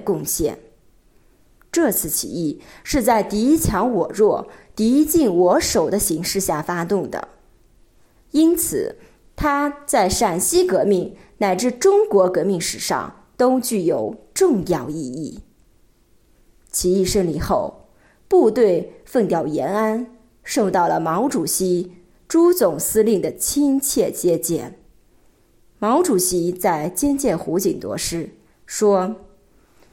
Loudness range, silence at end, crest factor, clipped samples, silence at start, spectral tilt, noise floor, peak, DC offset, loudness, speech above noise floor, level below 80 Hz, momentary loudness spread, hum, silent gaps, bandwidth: 4 LU; 0.75 s; 16 dB; under 0.1%; 0 s; -4.5 dB/octave; -56 dBFS; -4 dBFS; under 0.1%; -19 LUFS; 38 dB; -44 dBFS; 11 LU; none; none; 17 kHz